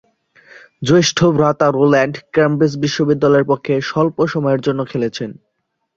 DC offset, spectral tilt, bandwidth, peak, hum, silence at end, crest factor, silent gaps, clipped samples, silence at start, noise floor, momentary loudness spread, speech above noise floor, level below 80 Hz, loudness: under 0.1%; -5.5 dB/octave; 7.8 kHz; -2 dBFS; none; 0.65 s; 14 dB; none; under 0.1%; 0.8 s; -48 dBFS; 8 LU; 33 dB; -54 dBFS; -15 LUFS